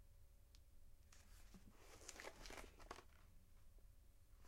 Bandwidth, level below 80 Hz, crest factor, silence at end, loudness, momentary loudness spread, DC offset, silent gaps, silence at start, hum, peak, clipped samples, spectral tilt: 16 kHz; -66 dBFS; 28 dB; 0 s; -61 LUFS; 11 LU; under 0.1%; none; 0 s; none; -34 dBFS; under 0.1%; -3 dB/octave